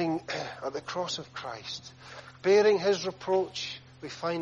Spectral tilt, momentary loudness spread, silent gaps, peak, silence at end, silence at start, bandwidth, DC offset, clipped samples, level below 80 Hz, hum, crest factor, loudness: -4 dB/octave; 19 LU; none; -12 dBFS; 0 s; 0 s; 7.6 kHz; under 0.1%; under 0.1%; -68 dBFS; none; 18 dB; -29 LUFS